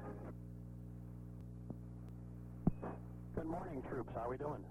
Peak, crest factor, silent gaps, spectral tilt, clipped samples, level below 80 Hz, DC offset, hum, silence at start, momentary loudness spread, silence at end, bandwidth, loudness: -20 dBFS; 26 dB; none; -10 dB/octave; under 0.1%; -56 dBFS; under 0.1%; 60 Hz at -55 dBFS; 0 s; 11 LU; 0 s; 14 kHz; -47 LUFS